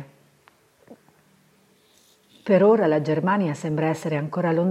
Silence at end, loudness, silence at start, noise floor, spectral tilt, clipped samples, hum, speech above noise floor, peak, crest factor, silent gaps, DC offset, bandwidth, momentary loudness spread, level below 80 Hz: 0 s; -22 LUFS; 0 s; -60 dBFS; -7.5 dB/octave; under 0.1%; none; 39 dB; -6 dBFS; 18 dB; none; under 0.1%; 12.5 kHz; 9 LU; -70 dBFS